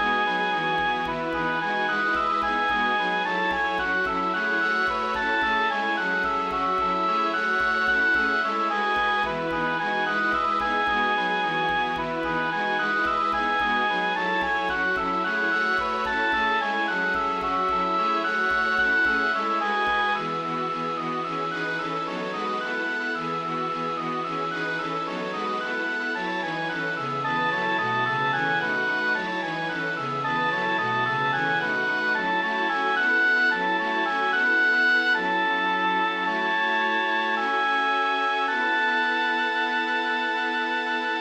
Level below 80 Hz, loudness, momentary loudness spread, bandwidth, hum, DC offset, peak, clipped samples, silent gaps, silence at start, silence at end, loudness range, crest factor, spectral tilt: -54 dBFS; -24 LUFS; 6 LU; 15.5 kHz; none; under 0.1%; -12 dBFS; under 0.1%; none; 0 s; 0 s; 6 LU; 12 dB; -4.5 dB/octave